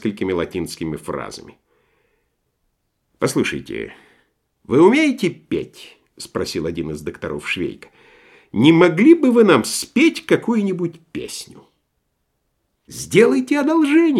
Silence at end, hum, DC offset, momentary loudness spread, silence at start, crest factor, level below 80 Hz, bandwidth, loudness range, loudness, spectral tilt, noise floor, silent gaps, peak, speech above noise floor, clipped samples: 0 s; none; under 0.1%; 18 LU; 0.05 s; 18 dB; -54 dBFS; 13.5 kHz; 12 LU; -17 LUFS; -5.5 dB/octave; -71 dBFS; none; 0 dBFS; 53 dB; under 0.1%